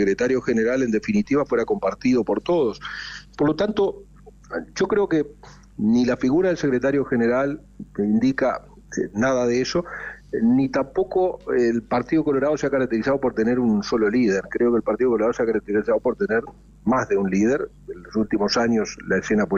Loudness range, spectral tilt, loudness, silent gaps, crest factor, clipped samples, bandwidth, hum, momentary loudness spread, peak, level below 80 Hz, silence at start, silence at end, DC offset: 3 LU; -6 dB/octave; -22 LUFS; none; 10 dB; under 0.1%; 7.4 kHz; none; 10 LU; -12 dBFS; -50 dBFS; 0 s; 0 s; under 0.1%